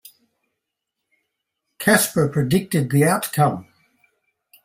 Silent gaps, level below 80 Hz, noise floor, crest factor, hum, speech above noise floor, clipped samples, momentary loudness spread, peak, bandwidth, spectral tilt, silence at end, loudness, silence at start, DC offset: none; -56 dBFS; -81 dBFS; 18 dB; none; 62 dB; under 0.1%; 5 LU; -4 dBFS; 16.5 kHz; -5 dB/octave; 1 s; -19 LUFS; 1.8 s; under 0.1%